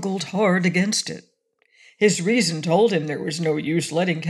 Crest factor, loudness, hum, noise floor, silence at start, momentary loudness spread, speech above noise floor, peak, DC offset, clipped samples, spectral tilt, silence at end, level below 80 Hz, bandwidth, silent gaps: 18 dB; -21 LUFS; none; -64 dBFS; 0 s; 7 LU; 43 dB; -4 dBFS; under 0.1%; under 0.1%; -4.5 dB/octave; 0 s; -74 dBFS; 13 kHz; none